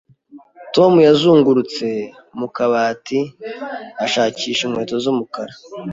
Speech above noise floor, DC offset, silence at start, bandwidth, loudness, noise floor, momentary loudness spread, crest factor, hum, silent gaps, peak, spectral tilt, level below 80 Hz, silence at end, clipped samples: 28 dB; under 0.1%; 0.35 s; 7.8 kHz; -16 LUFS; -44 dBFS; 18 LU; 16 dB; none; none; -2 dBFS; -5.5 dB/octave; -60 dBFS; 0 s; under 0.1%